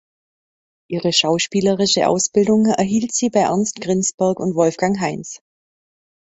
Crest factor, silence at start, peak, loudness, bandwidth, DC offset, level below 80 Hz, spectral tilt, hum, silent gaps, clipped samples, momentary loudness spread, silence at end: 16 dB; 0.9 s; -2 dBFS; -17 LUFS; 8.2 kHz; under 0.1%; -58 dBFS; -4 dB/octave; none; 4.14-4.18 s; under 0.1%; 8 LU; 1 s